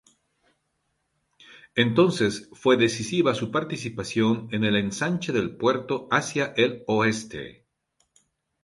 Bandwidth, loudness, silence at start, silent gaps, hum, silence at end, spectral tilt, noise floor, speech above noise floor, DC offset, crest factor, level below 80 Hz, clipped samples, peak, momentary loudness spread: 11.5 kHz; -24 LUFS; 1.5 s; none; none; 1.1 s; -5 dB/octave; -75 dBFS; 51 dB; under 0.1%; 20 dB; -60 dBFS; under 0.1%; -6 dBFS; 9 LU